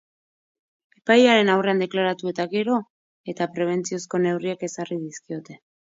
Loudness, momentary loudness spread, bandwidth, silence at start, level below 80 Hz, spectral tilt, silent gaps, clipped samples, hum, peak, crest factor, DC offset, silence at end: -22 LUFS; 18 LU; 7.8 kHz; 1.05 s; -74 dBFS; -5 dB/octave; 2.90-3.24 s; under 0.1%; none; -4 dBFS; 20 dB; under 0.1%; 0.4 s